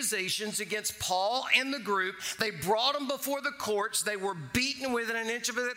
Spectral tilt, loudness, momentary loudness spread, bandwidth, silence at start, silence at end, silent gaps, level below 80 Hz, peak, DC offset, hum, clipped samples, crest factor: -2 dB/octave; -30 LUFS; 6 LU; 16 kHz; 0 s; 0 s; none; -64 dBFS; -10 dBFS; under 0.1%; none; under 0.1%; 22 dB